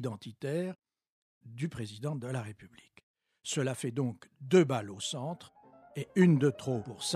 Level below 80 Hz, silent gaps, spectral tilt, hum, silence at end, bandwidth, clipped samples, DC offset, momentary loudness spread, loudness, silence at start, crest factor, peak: -74 dBFS; 1.10-1.41 s, 3.03-3.14 s; -6 dB/octave; none; 0 s; 14 kHz; under 0.1%; under 0.1%; 20 LU; -32 LUFS; 0 s; 20 dB; -12 dBFS